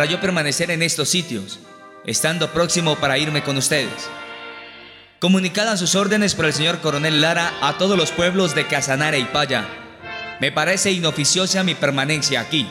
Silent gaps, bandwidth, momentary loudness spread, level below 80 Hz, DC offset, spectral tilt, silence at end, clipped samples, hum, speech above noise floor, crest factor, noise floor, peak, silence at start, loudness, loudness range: none; 16.5 kHz; 14 LU; -54 dBFS; under 0.1%; -3 dB/octave; 0 s; under 0.1%; none; 23 dB; 16 dB; -42 dBFS; -4 dBFS; 0 s; -18 LUFS; 3 LU